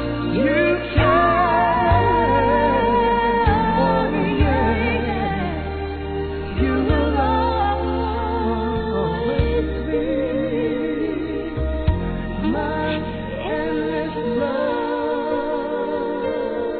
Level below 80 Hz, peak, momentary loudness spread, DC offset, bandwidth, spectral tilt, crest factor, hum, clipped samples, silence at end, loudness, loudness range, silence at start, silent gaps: -30 dBFS; -4 dBFS; 8 LU; 0.1%; 4.5 kHz; -10.5 dB/octave; 16 dB; none; under 0.1%; 0 s; -20 LUFS; 6 LU; 0 s; none